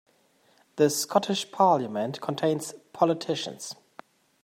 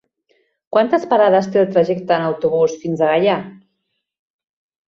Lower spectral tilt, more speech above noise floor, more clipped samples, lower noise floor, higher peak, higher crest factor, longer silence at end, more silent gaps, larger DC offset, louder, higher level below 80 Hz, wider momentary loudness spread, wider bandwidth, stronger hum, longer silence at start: second, -4.5 dB/octave vs -6.5 dB/octave; second, 38 dB vs 58 dB; neither; second, -64 dBFS vs -73 dBFS; second, -8 dBFS vs -2 dBFS; about the same, 20 dB vs 16 dB; second, 0.7 s vs 1.3 s; neither; neither; second, -26 LUFS vs -16 LUFS; second, -80 dBFS vs -62 dBFS; first, 16 LU vs 5 LU; first, 16 kHz vs 7.4 kHz; neither; about the same, 0.75 s vs 0.7 s